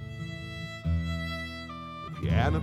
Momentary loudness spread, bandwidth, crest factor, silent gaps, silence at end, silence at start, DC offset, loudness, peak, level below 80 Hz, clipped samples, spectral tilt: 12 LU; 12.5 kHz; 18 dB; none; 0 s; 0 s; under 0.1%; -33 LUFS; -12 dBFS; -40 dBFS; under 0.1%; -7 dB/octave